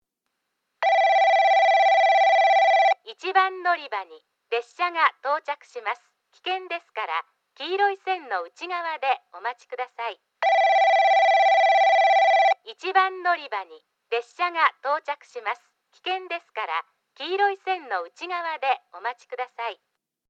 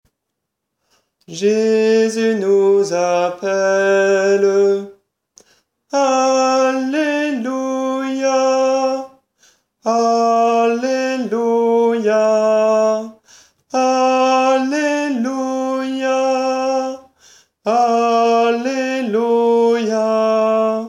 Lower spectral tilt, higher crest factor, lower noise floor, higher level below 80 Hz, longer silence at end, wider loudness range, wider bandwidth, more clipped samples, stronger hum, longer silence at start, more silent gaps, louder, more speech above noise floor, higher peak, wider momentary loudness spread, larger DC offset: second, 0.5 dB/octave vs -4 dB/octave; first, 18 dB vs 12 dB; about the same, -80 dBFS vs -77 dBFS; second, under -90 dBFS vs -72 dBFS; first, 0.55 s vs 0 s; first, 10 LU vs 3 LU; second, 7.6 kHz vs 11 kHz; neither; neither; second, 0.8 s vs 1.3 s; neither; second, -22 LUFS vs -16 LUFS; second, 53 dB vs 63 dB; about the same, -6 dBFS vs -4 dBFS; first, 16 LU vs 7 LU; neither